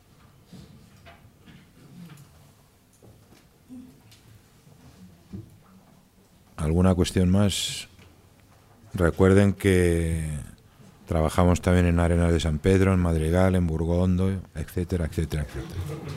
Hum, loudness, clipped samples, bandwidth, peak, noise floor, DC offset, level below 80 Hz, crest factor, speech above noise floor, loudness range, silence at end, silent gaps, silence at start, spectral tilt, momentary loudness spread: none; -24 LUFS; under 0.1%; 15 kHz; -6 dBFS; -58 dBFS; under 0.1%; -42 dBFS; 20 dB; 35 dB; 4 LU; 0 s; none; 0.55 s; -6.5 dB/octave; 23 LU